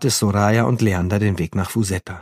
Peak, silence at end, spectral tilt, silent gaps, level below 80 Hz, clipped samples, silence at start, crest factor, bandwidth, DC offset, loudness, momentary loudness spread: -2 dBFS; 0 s; -5.5 dB/octave; none; -44 dBFS; under 0.1%; 0 s; 16 dB; 15.5 kHz; under 0.1%; -19 LUFS; 6 LU